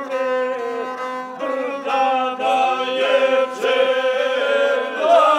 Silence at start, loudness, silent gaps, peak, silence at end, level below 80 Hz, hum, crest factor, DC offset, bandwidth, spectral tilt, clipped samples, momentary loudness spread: 0 s; -19 LUFS; none; -4 dBFS; 0 s; -86 dBFS; none; 16 dB; under 0.1%; 12 kHz; -2.5 dB/octave; under 0.1%; 9 LU